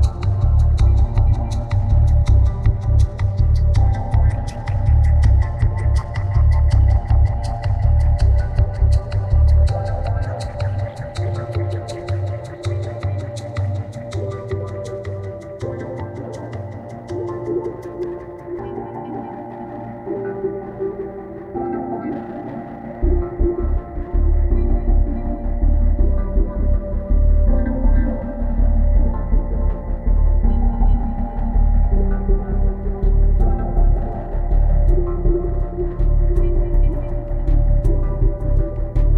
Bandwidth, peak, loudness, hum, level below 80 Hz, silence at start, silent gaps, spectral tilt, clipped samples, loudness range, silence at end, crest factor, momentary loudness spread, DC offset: 6.6 kHz; -4 dBFS; -21 LUFS; none; -18 dBFS; 0 s; none; -9 dB/octave; under 0.1%; 10 LU; 0 s; 12 dB; 12 LU; under 0.1%